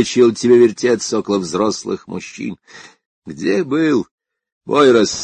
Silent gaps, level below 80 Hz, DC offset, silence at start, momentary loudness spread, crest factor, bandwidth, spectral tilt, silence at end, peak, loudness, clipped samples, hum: 3.06-3.22 s, 4.11-4.18 s, 4.52-4.61 s; -56 dBFS; under 0.1%; 0 s; 17 LU; 16 dB; 9.6 kHz; -4.5 dB/octave; 0 s; 0 dBFS; -15 LUFS; under 0.1%; none